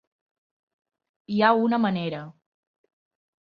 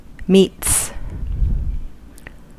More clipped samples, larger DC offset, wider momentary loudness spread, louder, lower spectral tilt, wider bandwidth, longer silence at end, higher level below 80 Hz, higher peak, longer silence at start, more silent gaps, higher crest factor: neither; neither; second, 12 LU vs 16 LU; second, -23 LUFS vs -18 LUFS; first, -8.5 dB/octave vs -4.5 dB/octave; second, 5.4 kHz vs 16 kHz; first, 1.1 s vs 0.05 s; second, -72 dBFS vs -26 dBFS; about the same, -4 dBFS vs -2 dBFS; first, 1.3 s vs 0 s; neither; first, 24 dB vs 18 dB